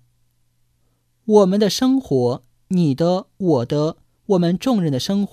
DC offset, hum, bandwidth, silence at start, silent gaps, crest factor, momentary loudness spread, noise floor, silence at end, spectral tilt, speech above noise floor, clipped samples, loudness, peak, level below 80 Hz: under 0.1%; none; 15 kHz; 1.25 s; none; 18 dB; 8 LU; -64 dBFS; 0.05 s; -6.5 dB/octave; 46 dB; under 0.1%; -19 LUFS; -2 dBFS; -56 dBFS